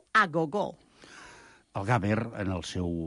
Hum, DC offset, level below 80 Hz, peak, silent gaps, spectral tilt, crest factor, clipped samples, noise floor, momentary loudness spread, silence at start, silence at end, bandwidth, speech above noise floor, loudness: none; under 0.1%; -50 dBFS; -12 dBFS; none; -6 dB/octave; 18 dB; under 0.1%; -54 dBFS; 24 LU; 0.15 s; 0 s; 11.5 kHz; 24 dB; -29 LUFS